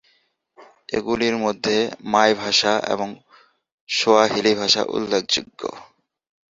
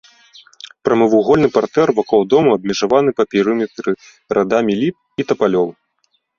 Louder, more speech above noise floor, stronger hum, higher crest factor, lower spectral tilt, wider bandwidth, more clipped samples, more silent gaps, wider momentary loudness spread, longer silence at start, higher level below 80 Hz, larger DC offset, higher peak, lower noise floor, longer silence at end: second, -20 LUFS vs -16 LUFS; second, 44 dB vs 50 dB; neither; first, 20 dB vs 14 dB; second, -3 dB/octave vs -6 dB/octave; about the same, 7.8 kHz vs 7.4 kHz; neither; first, 3.72-3.87 s vs none; about the same, 11 LU vs 10 LU; second, 0.6 s vs 0.85 s; second, -58 dBFS vs -52 dBFS; neither; about the same, -2 dBFS vs -2 dBFS; about the same, -64 dBFS vs -65 dBFS; about the same, 0.65 s vs 0.65 s